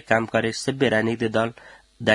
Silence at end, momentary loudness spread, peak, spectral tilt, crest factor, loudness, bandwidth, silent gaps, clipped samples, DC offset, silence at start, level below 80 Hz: 0 s; 5 LU; -2 dBFS; -5 dB/octave; 22 dB; -23 LUFS; 11.5 kHz; none; under 0.1%; under 0.1%; 0.1 s; -58 dBFS